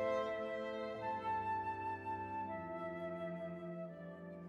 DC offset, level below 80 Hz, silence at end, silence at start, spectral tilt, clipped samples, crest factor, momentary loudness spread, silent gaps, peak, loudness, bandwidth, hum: under 0.1%; -74 dBFS; 0 s; 0 s; -7 dB/octave; under 0.1%; 14 dB; 8 LU; none; -28 dBFS; -43 LUFS; 11.5 kHz; none